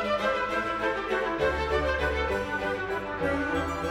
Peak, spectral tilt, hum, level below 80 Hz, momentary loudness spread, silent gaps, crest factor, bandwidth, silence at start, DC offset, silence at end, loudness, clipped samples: -12 dBFS; -5.5 dB/octave; none; -40 dBFS; 3 LU; none; 16 dB; 16.5 kHz; 0 s; under 0.1%; 0 s; -28 LUFS; under 0.1%